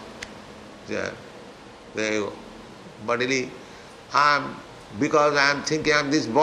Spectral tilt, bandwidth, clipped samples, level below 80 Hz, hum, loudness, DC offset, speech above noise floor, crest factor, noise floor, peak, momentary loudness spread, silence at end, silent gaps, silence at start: -3.5 dB/octave; 12 kHz; under 0.1%; -58 dBFS; none; -23 LUFS; under 0.1%; 21 dB; 22 dB; -44 dBFS; -4 dBFS; 23 LU; 0 s; none; 0 s